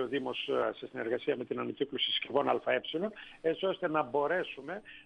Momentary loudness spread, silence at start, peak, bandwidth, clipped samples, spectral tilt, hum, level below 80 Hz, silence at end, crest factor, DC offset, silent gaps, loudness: 8 LU; 0 s; -14 dBFS; 9.2 kHz; under 0.1%; -6 dB/octave; none; -74 dBFS; 0.05 s; 18 dB; under 0.1%; none; -33 LUFS